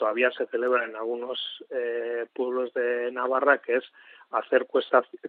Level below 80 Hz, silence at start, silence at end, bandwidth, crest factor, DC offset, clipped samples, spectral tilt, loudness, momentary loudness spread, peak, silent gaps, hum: under -90 dBFS; 0 s; 0 s; 4.6 kHz; 20 dB; under 0.1%; under 0.1%; 0.5 dB/octave; -27 LUFS; 9 LU; -6 dBFS; none; none